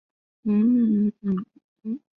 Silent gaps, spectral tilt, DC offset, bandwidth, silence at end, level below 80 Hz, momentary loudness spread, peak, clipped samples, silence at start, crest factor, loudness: 1.64-1.76 s; -12.5 dB/octave; under 0.1%; 3.5 kHz; 0.2 s; -66 dBFS; 16 LU; -14 dBFS; under 0.1%; 0.45 s; 10 dB; -23 LUFS